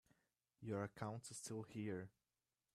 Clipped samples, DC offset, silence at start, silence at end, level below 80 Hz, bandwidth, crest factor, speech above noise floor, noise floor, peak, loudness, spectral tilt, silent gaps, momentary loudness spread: under 0.1%; under 0.1%; 0.6 s; 0.65 s; -82 dBFS; 14.5 kHz; 22 dB; over 41 dB; under -90 dBFS; -30 dBFS; -50 LUFS; -5.5 dB/octave; none; 6 LU